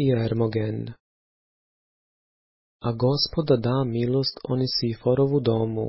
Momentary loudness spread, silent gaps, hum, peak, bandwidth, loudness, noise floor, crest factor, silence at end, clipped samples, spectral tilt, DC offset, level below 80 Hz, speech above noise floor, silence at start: 9 LU; 1.00-2.79 s; none; -8 dBFS; 5.8 kHz; -24 LUFS; under -90 dBFS; 16 dB; 0 s; under 0.1%; -10 dB/octave; under 0.1%; -52 dBFS; over 67 dB; 0 s